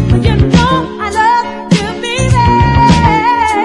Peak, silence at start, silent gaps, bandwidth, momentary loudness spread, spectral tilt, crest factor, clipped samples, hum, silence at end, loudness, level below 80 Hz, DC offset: 0 dBFS; 0 s; none; 11.5 kHz; 7 LU; -6 dB/octave; 10 dB; 0.1%; none; 0 s; -10 LUFS; -22 dBFS; under 0.1%